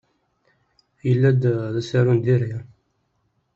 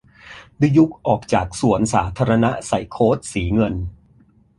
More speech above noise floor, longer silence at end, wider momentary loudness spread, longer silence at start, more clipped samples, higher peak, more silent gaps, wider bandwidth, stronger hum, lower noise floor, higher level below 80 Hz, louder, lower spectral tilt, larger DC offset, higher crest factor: first, 50 dB vs 36 dB; first, 0.95 s vs 0.65 s; first, 11 LU vs 7 LU; first, 1.05 s vs 0.25 s; neither; second, -6 dBFS vs -2 dBFS; neither; second, 7.4 kHz vs 11.5 kHz; neither; first, -69 dBFS vs -54 dBFS; second, -58 dBFS vs -38 dBFS; about the same, -20 LUFS vs -19 LUFS; first, -8.5 dB/octave vs -6.5 dB/octave; neither; about the same, 16 dB vs 16 dB